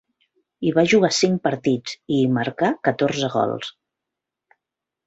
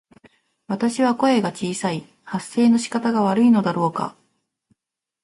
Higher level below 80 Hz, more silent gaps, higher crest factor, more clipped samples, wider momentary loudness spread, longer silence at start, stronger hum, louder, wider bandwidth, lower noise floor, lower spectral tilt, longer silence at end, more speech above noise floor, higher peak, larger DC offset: about the same, -62 dBFS vs -66 dBFS; neither; about the same, 18 dB vs 14 dB; neither; second, 9 LU vs 14 LU; about the same, 0.6 s vs 0.7 s; neither; about the same, -21 LUFS vs -21 LUFS; second, 8.2 kHz vs 11.5 kHz; about the same, -85 dBFS vs -85 dBFS; about the same, -5 dB/octave vs -5.5 dB/octave; first, 1.35 s vs 1.1 s; about the same, 65 dB vs 66 dB; about the same, -4 dBFS vs -6 dBFS; neither